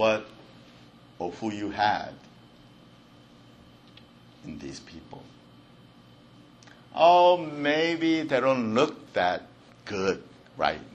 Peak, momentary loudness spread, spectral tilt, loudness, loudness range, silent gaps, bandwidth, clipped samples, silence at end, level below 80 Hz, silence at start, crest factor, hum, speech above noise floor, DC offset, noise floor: -6 dBFS; 25 LU; -5 dB/octave; -25 LUFS; 23 LU; none; 8.6 kHz; under 0.1%; 0.05 s; -64 dBFS; 0 s; 22 dB; none; 28 dB; under 0.1%; -53 dBFS